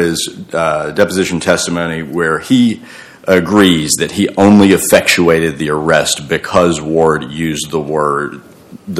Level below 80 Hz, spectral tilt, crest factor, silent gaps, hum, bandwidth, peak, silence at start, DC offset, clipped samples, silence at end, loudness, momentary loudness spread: -44 dBFS; -4.5 dB/octave; 12 dB; none; none; 16 kHz; 0 dBFS; 0 s; under 0.1%; 0.9%; 0 s; -12 LUFS; 10 LU